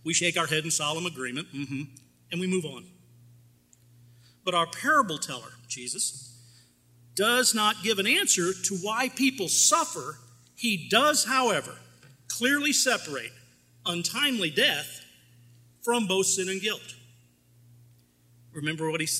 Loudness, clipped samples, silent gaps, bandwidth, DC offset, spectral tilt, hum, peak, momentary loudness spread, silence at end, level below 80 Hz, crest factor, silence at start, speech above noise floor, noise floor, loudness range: -26 LUFS; under 0.1%; none; 16 kHz; under 0.1%; -2 dB/octave; 60 Hz at -55 dBFS; -6 dBFS; 15 LU; 0 s; -72 dBFS; 22 dB; 0.05 s; 33 dB; -60 dBFS; 6 LU